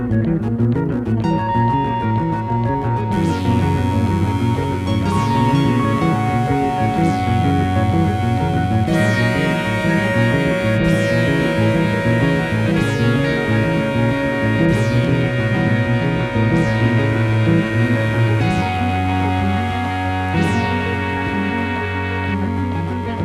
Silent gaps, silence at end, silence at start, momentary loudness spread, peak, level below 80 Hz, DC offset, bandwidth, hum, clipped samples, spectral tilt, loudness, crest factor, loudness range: none; 0 s; 0 s; 4 LU; -2 dBFS; -36 dBFS; under 0.1%; 13 kHz; none; under 0.1%; -7.5 dB/octave; -17 LUFS; 14 dB; 2 LU